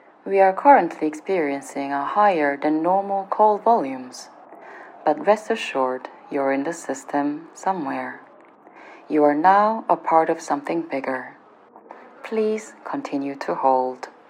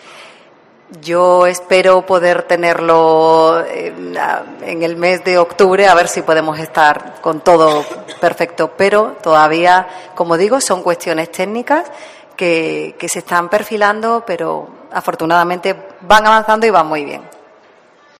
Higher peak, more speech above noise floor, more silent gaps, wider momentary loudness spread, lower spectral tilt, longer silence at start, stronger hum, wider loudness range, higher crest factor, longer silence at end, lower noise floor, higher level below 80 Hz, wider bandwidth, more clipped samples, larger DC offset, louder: about the same, 0 dBFS vs 0 dBFS; second, 28 dB vs 34 dB; neither; about the same, 14 LU vs 12 LU; about the same, -5 dB/octave vs -4 dB/octave; about the same, 0.25 s vs 0.15 s; neither; about the same, 7 LU vs 5 LU; first, 22 dB vs 14 dB; second, 0.2 s vs 0.95 s; about the same, -49 dBFS vs -46 dBFS; second, under -90 dBFS vs -50 dBFS; second, 13.5 kHz vs 16 kHz; second, under 0.1% vs 0.3%; neither; second, -21 LUFS vs -13 LUFS